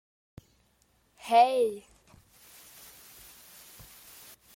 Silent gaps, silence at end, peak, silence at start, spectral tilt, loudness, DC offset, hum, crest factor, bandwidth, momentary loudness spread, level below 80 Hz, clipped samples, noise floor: none; 2.75 s; -10 dBFS; 1.25 s; -3 dB/octave; -25 LUFS; under 0.1%; none; 22 dB; 17 kHz; 27 LU; -68 dBFS; under 0.1%; -68 dBFS